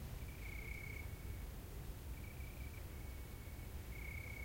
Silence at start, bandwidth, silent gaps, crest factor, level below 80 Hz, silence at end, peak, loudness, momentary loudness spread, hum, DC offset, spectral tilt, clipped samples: 0 s; 16.5 kHz; none; 14 dB; -52 dBFS; 0 s; -34 dBFS; -51 LUFS; 3 LU; none; under 0.1%; -5 dB/octave; under 0.1%